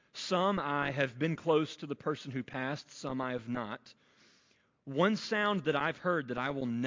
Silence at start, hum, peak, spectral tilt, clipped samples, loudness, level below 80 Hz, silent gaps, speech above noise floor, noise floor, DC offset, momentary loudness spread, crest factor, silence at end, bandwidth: 0.15 s; none; -14 dBFS; -5.5 dB/octave; under 0.1%; -33 LUFS; -68 dBFS; none; 37 dB; -70 dBFS; under 0.1%; 9 LU; 20 dB; 0 s; 7.6 kHz